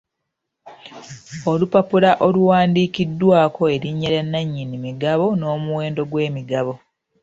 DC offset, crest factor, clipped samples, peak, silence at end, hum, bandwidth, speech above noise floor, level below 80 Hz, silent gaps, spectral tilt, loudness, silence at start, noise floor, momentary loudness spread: under 0.1%; 18 dB; under 0.1%; -2 dBFS; 0.45 s; none; 7.8 kHz; 60 dB; -56 dBFS; none; -7.5 dB/octave; -19 LUFS; 0.65 s; -79 dBFS; 13 LU